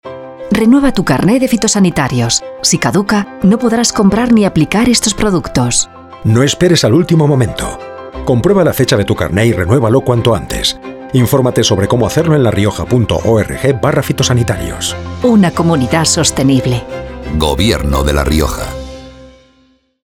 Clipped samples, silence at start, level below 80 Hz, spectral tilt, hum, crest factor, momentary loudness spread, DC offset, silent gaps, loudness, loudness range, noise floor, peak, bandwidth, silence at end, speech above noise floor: under 0.1%; 0.05 s; -28 dBFS; -5 dB/octave; none; 12 dB; 9 LU; under 0.1%; none; -12 LUFS; 2 LU; -52 dBFS; 0 dBFS; 17.5 kHz; 0.8 s; 41 dB